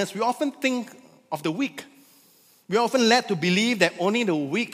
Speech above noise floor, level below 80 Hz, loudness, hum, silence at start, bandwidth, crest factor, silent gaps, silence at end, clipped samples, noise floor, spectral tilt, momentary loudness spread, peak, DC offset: 34 dB; -76 dBFS; -23 LUFS; none; 0 s; 15.5 kHz; 22 dB; none; 0 s; under 0.1%; -58 dBFS; -4 dB/octave; 11 LU; -2 dBFS; under 0.1%